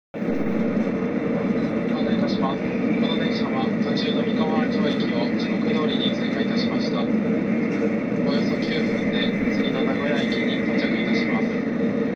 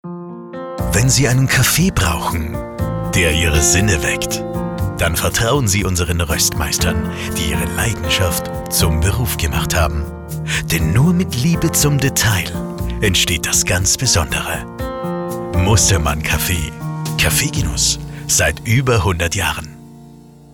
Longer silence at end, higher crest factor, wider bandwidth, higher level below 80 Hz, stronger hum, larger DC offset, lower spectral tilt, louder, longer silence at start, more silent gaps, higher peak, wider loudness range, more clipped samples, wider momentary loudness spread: second, 0 s vs 0.25 s; about the same, 14 dB vs 14 dB; second, 7 kHz vs 19.5 kHz; second, -54 dBFS vs -28 dBFS; neither; neither; first, -7 dB/octave vs -3.5 dB/octave; second, -23 LUFS vs -16 LUFS; about the same, 0.15 s vs 0.05 s; neither; second, -8 dBFS vs -2 dBFS; about the same, 1 LU vs 2 LU; neither; second, 2 LU vs 11 LU